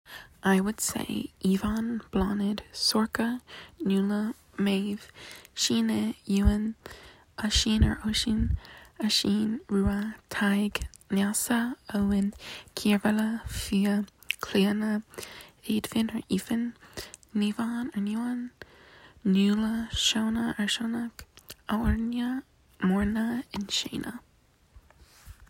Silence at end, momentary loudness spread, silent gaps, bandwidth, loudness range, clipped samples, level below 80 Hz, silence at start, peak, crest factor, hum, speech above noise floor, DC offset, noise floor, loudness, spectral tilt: 0.05 s; 15 LU; none; 16.5 kHz; 4 LU; under 0.1%; -42 dBFS; 0.1 s; -8 dBFS; 20 dB; none; 35 dB; under 0.1%; -63 dBFS; -28 LUFS; -4.5 dB/octave